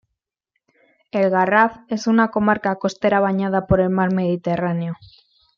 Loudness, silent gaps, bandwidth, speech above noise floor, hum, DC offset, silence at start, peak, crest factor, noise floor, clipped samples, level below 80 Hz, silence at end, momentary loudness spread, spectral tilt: -19 LUFS; none; 7.2 kHz; 61 dB; none; under 0.1%; 1.15 s; -2 dBFS; 18 dB; -80 dBFS; under 0.1%; -46 dBFS; 0.65 s; 8 LU; -7 dB/octave